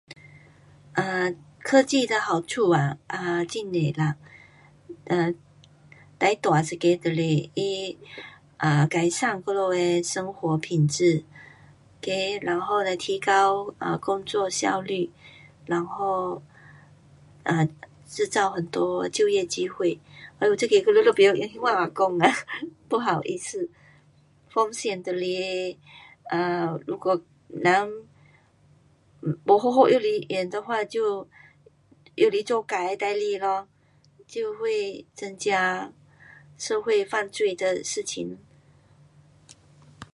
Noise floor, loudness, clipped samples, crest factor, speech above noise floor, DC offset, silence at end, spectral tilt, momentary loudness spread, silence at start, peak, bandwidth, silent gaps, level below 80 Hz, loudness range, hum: -59 dBFS; -25 LUFS; under 0.1%; 24 dB; 34 dB; under 0.1%; 0.1 s; -5 dB/octave; 14 LU; 0.1 s; -2 dBFS; 11.5 kHz; none; -68 dBFS; 7 LU; none